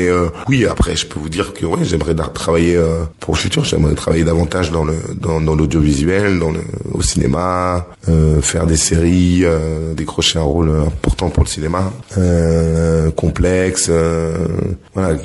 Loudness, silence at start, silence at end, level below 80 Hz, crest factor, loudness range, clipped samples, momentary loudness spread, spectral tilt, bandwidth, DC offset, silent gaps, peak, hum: -15 LUFS; 0 s; 0 s; -24 dBFS; 14 dB; 2 LU; under 0.1%; 7 LU; -5.5 dB/octave; 11.5 kHz; under 0.1%; none; 0 dBFS; none